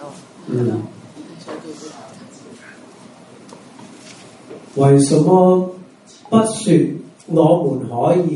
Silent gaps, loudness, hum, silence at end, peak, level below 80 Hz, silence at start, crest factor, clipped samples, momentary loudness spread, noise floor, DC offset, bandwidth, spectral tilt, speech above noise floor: none; -15 LUFS; none; 0 s; 0 dBFS; -60 dBFS; 0 s; 18 dB; under 0.1%; 26 LU; -42 dBFS; under 0.1%; 11.5 kHz; -7 dB/octave; 28 dB